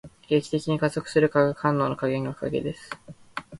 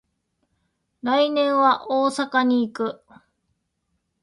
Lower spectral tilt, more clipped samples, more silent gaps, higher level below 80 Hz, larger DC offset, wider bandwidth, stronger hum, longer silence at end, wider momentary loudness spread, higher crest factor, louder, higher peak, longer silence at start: first, -6.5 dB/octave vs -4 dB/octave; neither; neither; first, -58 dBFS vs -70 dBFS; neither; about the same, 11.5 kHz vs 11 kHz; neither; second, 0 s vs 1.3 s; first, 16 LU vs 10 LU; about the same, 18 dB vs 18 dB; second, -25 LUFS vs -21 LUFS; about the same, -8 dBFS vs -6 dBFS; second, 0.05 s vs 1.05 s